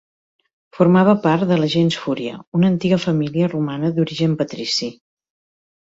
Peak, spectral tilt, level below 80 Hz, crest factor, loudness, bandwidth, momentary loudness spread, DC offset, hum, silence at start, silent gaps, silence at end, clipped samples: -2 dBFS; -6.5 dB/octave; -58 dBFS; 16 dB; -18 LUFS; 7.8 kHz; 9 LU; under 0.1%; none; 0.75 s; 2.47-2.52 s; 0.95 s; under 0.1%